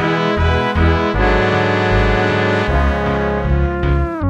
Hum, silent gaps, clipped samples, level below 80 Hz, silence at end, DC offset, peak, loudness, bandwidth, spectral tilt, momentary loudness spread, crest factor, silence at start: none; none; under 0.1%; -20 dBFS; 0 s; under 0.1%; -2 dBFS; -15 LUFS; 8.4 kHz; -7 dB/octave; 3 LU; 14 dB; 0 s